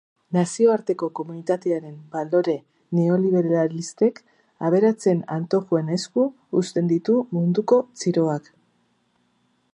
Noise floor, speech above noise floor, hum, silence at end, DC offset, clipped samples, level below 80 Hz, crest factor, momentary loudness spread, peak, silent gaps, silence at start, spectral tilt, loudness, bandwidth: -66 dBFS; 45 dB; none; 1.35 s; under 0.1%; under 0.1%; -74 dBFS; 18 dB; 8 LU; -6 dBFS; none; 0.3 s; -7 dB/octave; -22 LUFS; 10.5 kHz